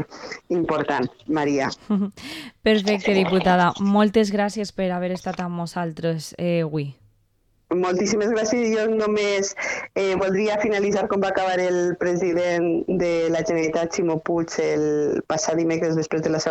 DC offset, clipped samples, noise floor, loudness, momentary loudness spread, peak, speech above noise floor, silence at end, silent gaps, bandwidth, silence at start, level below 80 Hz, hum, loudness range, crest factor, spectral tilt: under 0.1%; under 0.1%; -64 dBFS; -22 LUFS; 8 LU; -6 dBFS; 42 dB; 0 s; none; 12.5 kHz; 0 s; -54 dBFS; none; 4 LU; 16 dB; -5 dB/octave